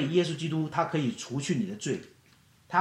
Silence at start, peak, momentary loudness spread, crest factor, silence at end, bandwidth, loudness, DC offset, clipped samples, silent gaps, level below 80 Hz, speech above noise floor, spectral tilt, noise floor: 0 s; -10 dBFS; 6 LU; 20 dB; 0 s; 12 kHz; -30 LUFS; under 0.1%; under 0.1%; none; -70 dBFS; 32 dB; -5.5 dB/octave; -61 dBFS